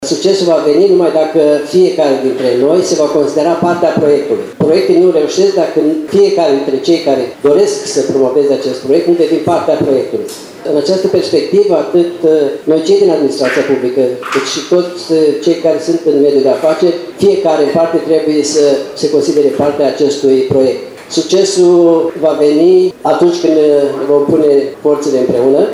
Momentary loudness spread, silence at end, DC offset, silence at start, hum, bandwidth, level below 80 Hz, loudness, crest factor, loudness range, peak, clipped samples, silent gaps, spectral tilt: 5 LU; 0 s; under 0.1%; 0 s; none; 13 kHz; -56 dBFS; -11 LUFS; 10 dB; 2 LU; 0 dBFS; under 0.1%; none; -5 dB/octave